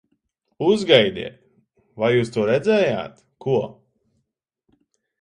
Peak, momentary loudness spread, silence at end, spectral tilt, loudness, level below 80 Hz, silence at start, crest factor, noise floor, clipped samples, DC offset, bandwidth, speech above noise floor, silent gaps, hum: 0 dBFS; 17 LU; 1.5 s; -6 dB/octave; -20 LUFS; -60 dBFS; 0.6 s; 22 dB; -76 dBFS; under 0.1%; under 0.1%; 11 kHz; 57 dB; none; none